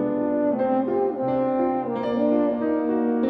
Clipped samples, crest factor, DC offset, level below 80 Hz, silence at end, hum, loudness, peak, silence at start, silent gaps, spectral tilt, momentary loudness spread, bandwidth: under 0.1%; 12 dB; under 0.1%; -60 dBFS; 0 s; none; -23 LUFS; -10 dBFS; 0 s; none; -10 dB/octave; 2 LU; 4.9 kHz